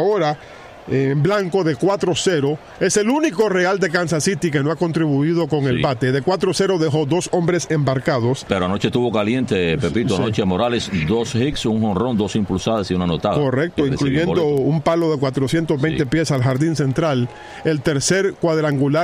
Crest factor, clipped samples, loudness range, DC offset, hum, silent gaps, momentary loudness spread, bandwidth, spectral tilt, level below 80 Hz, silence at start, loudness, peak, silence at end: 16 dB; under 0.1%; 1 LU; under 0.1%; none; none; 3 LU; 15.5 kHz; -5.5 dB/octave; -44 dBFS; 0 s; -19 LUFS; -2 dBFS; 0 s